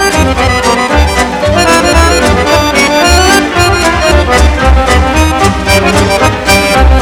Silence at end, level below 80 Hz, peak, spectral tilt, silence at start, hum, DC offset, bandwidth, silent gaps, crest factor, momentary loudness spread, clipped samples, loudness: 0 s; -14 dBFS; 0 dBFS; -4 dB/octave; 0 s; none; under 0.1%; 18 kHz; none; 6 dB; 3 LU; 5%; -7 LUFS